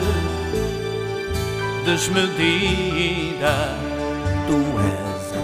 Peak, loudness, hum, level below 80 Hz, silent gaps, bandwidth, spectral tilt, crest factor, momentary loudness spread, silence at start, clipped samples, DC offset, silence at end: -4 dBFS; -22 LUFS; none; -34 dBFS; none; 15.5 kHz; -5 dB/octave; 18 dB; 7 LU; 0 s; under 0.1%; under 0.1%; 0 s